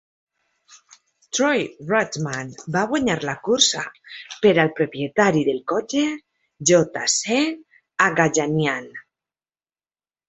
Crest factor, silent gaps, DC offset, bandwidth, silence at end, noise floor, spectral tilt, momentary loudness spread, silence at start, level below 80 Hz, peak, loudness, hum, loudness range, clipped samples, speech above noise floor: 20 dB; none; under 0.1%; 8.4 kHz; 1.25 s; under -90 dBFS; -3.5 dB/octave; 14 LU; 0.7 s; -60 dBFS; -2 dBFS; -20 LUFS; none; 3 LU; under 0.1%; over 69 dB